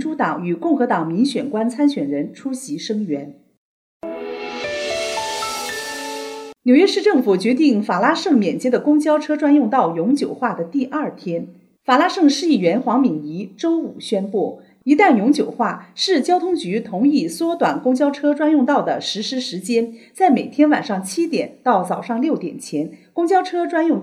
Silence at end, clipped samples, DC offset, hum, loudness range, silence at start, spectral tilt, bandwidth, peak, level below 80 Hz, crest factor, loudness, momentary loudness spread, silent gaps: 0 s; under 0.1%; under 0.1%; none; 7 LU; 0 s; -5 dB/octave; 14 kHz; -2 dBFS; -68 dBFS; 16 dB; -19 LUFS; 11 LU; 3.57-4.00 s